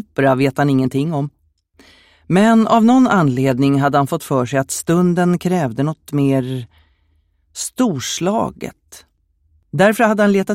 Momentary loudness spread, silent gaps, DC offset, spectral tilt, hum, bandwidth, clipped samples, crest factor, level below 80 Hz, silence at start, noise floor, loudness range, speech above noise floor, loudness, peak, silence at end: 14 LU; none; under 0.1%; -6 dB/octave; none; 16 kHz; under 0.1%; 16 dB; -54 dBFS; 0.2 s; -60 dBFS; 7 LU; 45 dB; -16 LUFS; 0 dBFS; 0 s